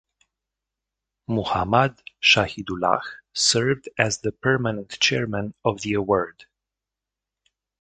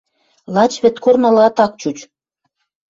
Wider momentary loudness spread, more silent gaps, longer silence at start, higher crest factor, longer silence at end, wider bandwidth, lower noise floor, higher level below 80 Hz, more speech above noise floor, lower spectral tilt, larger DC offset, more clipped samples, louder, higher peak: second, 10 LU vs 13 LU; neither; first, 1.3 s vs 0.5 s; first, 24 dB vs 14 dB; first, 1.4 s vs 0.85 s; first, 9.4 kHz vs 7.8 kHz; first, -87 dBFS vs -71 dBFS; first, -52 dBFS vs -60 dBFS; first, 64 dB vs 58 dB; second, -3.5 dB/octave vs -5.5 dB/octave; neither; neither; second, -22 LUFS vs -14 LUFS; about the same, 0 dBFS vs -2 dBFS